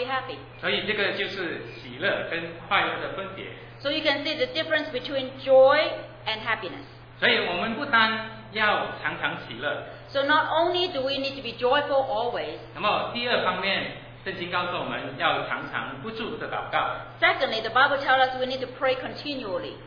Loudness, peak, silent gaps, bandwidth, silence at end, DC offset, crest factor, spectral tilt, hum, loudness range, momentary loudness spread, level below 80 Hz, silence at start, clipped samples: -25 LUFS; -4 dBFS; none; 5.4 kHz; 0 s; under 0.1%; 22 dB; -5.5 dB/octave; none; 4 LU; 12 LU; -56 dBFS; 0 s; under 0.1%